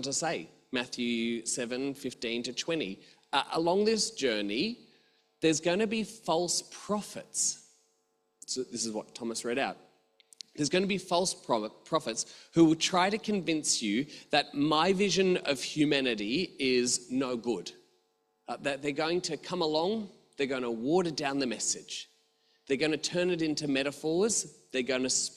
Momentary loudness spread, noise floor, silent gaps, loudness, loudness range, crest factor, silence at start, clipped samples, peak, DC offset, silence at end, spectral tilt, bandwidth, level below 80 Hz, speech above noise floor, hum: 10 LU; -75 dBFS; none; -30 LUFS; 5 LU; 20 dB; 0 s; under 0.1%; -10 dBFS; under 0.1%; 0 s; -3 dB/octave; 13.5 kHz; -70 dBFS; 45 dB; none